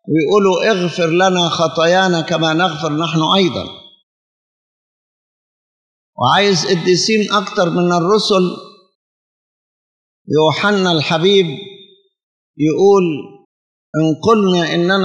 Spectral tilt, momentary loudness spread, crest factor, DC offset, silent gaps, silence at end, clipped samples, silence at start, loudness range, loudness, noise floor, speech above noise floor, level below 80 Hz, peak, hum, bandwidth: -5 dB/octave; 7 LU; 16 dB; under 0.1%; 4.03-6.13 s, 8.95-10.25 s, 12.23-12.54 s, 13.45-13.93 s; 0 s; under 0.1%; 0.05 s; 5 LU; -14 LUFS; -45 dBFS; 31 dB; -64 dBFS; 0 dBFS; none; 10 kHz